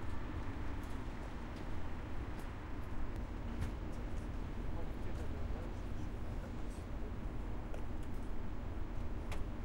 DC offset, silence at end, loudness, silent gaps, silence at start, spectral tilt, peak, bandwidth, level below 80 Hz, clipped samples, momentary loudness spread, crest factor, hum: under 0.1%; 0 s; -46 LUFS; none; 0 s; -7 dB/octave; -26 dBFS; 16 kHz; -44 dBFS; under 0.1%; 3 LU; 14 dB; none